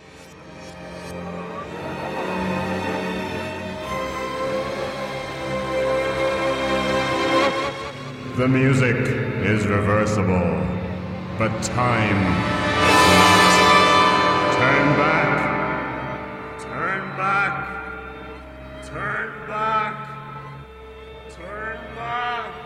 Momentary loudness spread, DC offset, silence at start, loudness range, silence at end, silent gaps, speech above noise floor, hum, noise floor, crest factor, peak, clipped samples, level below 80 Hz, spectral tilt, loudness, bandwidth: 20 LU; under 0.1%; 0.05 s; 13 LU; 0 s; none; 23 dB; none; -42 dBFS; 20 dB; -2 dBFS; under 0.1%; -44 dBFS; -4.5 dB/octave; -20 LUFS; 16 kHz